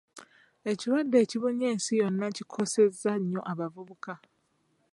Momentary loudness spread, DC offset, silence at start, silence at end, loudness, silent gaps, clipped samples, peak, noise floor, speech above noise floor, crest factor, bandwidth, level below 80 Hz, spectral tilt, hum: 17 LU; under 0.1%; 0.15 s; 0.75 s; -29 LUFS; none; under 0.1%; -12 dBFS; -72 dBFS; 44 dB; 18 dB; 11.5 kHz; -80 dBFS; -5 dB/octave; none